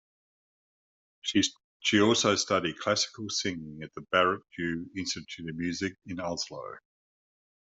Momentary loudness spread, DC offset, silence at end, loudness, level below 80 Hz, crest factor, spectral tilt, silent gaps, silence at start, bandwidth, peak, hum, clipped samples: 13 LU; under 0.1%; 0.85 s; -29 LUFS; -68 dBFS; 22 dB; -3 dB/octave; 1.64-1.80 s; 1.25 s; 8.2 kHz; -10 dBFS; none; under 0.1%